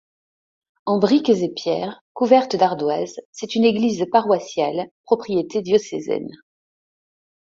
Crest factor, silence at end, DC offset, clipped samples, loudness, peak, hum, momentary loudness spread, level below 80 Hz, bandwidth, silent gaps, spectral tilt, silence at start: 18 dB; 1.25 s; under 0.1%; under 0.1%; -20 LUFS; -2 dBFS; none; 11 LU; -64 dBFS; 7.8 kHz; 2.01-2.15 s, 3.25-3.33 s, 4.91-5.04 s; -5.5 dB/octave; 0.85 s